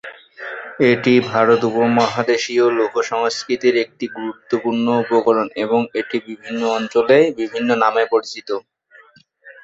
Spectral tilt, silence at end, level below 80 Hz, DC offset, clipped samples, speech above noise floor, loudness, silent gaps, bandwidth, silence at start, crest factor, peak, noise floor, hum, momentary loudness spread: -5 dB/octave; 0.15 s; -62 dBFS; under 0.1%; under 0.1%; 33 dB; -17 LUFS; none; 8 kHz; 0.05 s; 16 dB; -2 dBFS; -50 dBFS; none; 13 LU